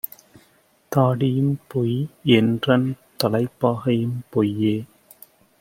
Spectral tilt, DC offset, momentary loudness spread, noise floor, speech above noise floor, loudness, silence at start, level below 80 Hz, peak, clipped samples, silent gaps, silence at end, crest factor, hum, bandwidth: -7 dB/octave; under 0.1%; 7 LU; -59 dBFS; 39 dB; -21 LUFS; 0.05 s; -60 dBFS; 0 dBFS; under 0.1%; none; 0.75 s; 22 dB; none; 16.5 kHz